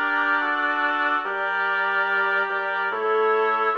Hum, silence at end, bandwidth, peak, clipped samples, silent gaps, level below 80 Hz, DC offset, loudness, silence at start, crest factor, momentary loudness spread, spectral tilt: none; 0 s; 7 kHz; -10 dBFS; under 0.1%; none; -76 dBFS; under 0.1%; -22 LUFS; 0 s; 12 dB; 3 LU; -3.5 dB/octave